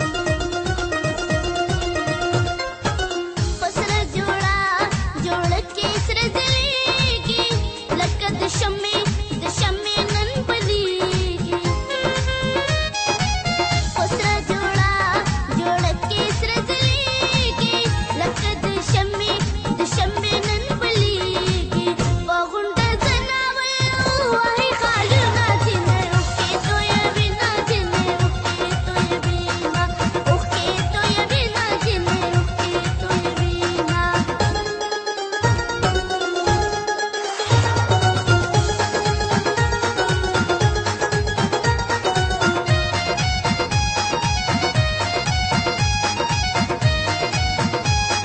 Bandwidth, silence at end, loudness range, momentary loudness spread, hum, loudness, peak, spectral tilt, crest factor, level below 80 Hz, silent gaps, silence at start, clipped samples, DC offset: 8.8 kHz; 0 s; 3 LU; 5 LU; none; -20 LUFS; -4 dBFS; -4.5 dB/octave; 16 dB; -30 dBFS; none; 0 s; under 0.1%; under 0.1%